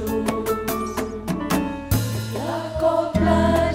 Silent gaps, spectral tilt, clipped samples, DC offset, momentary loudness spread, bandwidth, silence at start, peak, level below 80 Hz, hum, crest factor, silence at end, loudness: none; -6 dB/octave; under 0.1%; under 0.1%; 9 LU; 16.5 kHz; 0 s; -6 dBFS; -36 dBFS; none; 16 dB; 0 s; -23 LUFS